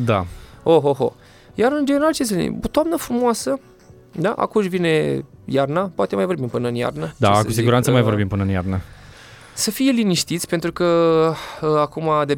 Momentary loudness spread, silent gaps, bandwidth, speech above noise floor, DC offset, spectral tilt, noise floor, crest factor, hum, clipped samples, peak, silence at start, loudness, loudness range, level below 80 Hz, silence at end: 8 LU; none; 19.5 kHz; 24 dB; under 0.1%; -5.5 dB/octave; -42 dBFS; 16 dB; none; under 0.1%; -2 dBFS; 0 s; -19 LUFS; 2 LU; -46 dBFS; 0 s